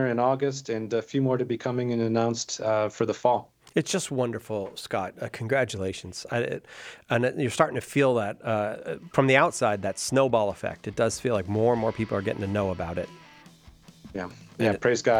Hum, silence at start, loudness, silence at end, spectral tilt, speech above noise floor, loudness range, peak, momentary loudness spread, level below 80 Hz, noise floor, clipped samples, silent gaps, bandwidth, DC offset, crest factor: none; 0 s; -27 LUFS; 0 s; -5 dB/octave; 26 dB; 5 LU; -4 dBFS; 10 LU; -60 dBFS; -52 dBFS; under 0.1%; none; 16.5 kHz; under 0.1%; 22 dB